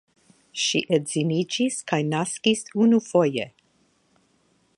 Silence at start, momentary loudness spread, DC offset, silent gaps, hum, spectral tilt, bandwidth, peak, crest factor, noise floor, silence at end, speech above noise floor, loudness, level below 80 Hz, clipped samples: 0.55 s; 6 LU; under 0.1%; none; none; -4.5 dB/octave; 11.5 kHz; -6 dBFS; 18 dB; -65 dBFS; 1.3 s; 42 dB; -23 LUFS; -72 dBFS; under 0.1%